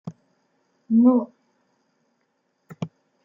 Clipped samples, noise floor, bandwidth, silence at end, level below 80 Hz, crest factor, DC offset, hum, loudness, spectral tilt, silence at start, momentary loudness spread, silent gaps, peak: under 0.1%; -72 dBFS; 3.5 kHz; 0.35 s; -72 dBFS; 18 dB; under 0.1%; none; -19 LUFS; -10 dB/octave; 0.05 s; 21 LU; none; -6 dBFS